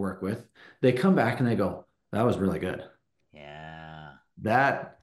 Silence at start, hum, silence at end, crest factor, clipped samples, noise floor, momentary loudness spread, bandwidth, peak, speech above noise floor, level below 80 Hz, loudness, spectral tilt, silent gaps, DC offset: 0 s; none; 0.15 s; 18 dB; under 0.1%; -47 dBFS; 20 LU; 12.5 kHz; -10 dBFS; 20 dB; -60 dBFS; -27 LUFS; -7.5 dB/octave; none; under 0.1%